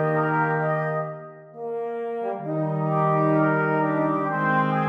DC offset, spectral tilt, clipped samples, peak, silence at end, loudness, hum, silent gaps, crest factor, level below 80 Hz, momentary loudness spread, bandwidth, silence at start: under 0.1%; -10 dB/octave; under 0.1%; -10 dBFS; 0 s; -24 LUFS; none; none; 14 dB; -74 dBFS; 11 LU; 5 kHz; 0 s